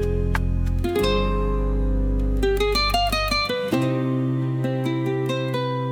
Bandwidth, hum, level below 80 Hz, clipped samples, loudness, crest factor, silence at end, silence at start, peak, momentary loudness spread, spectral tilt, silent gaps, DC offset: 18 kHz; none; -26 dBFS; under 0.1%; -23 LUFS; 14 dB; 0 s; 0 s; -8 dBFS; 4 LU; -6 dB/octave; none; under 0.1%